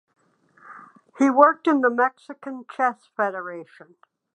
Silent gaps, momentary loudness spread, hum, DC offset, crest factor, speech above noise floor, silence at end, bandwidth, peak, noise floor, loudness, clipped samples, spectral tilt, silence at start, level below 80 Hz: none; 20 LU; none; under 0.1%; 22 dB; 35 dB; 0.7 s; 9 kHz; -2 dBFS; -57 dBFS; -21 LUFS; under 0.1%; -5.5 dB/octave; 0.65 s; -84 dBFS